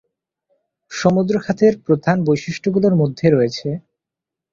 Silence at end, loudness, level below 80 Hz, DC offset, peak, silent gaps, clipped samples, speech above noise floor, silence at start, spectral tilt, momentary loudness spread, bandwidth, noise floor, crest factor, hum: 0.75 s; -17 LUFS; -56 dBFS; under 0.1%; -2 dBFS; none; under 0.1%; 69 dB; 0.9 s; -7 dB/octave; 10 LU; 7.6 kHz; -85 dBFS; 18 dB; none